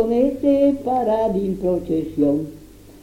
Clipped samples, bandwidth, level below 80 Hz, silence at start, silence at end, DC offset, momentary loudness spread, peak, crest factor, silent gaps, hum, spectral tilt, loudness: under 0.1%; 16 kHz; -44 dBFS; 0 s; 0.05 s; under 0.1%; 6 LU; -6 dBFS; 14 dB; none; none; -8.5 dB/octave; -20 LUFS